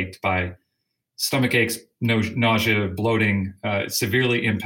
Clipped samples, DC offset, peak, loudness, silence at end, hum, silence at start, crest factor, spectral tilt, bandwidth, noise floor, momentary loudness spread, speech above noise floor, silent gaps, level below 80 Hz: under 0.1%; under 0.1%; -8 dBFS; -22 LUFS; 0 s; none; 0 s; 16 dB; -4.5 dB/octave; 17 kHz; -78 dBFS; 6 LU; 56 dB; none; -56 dBFS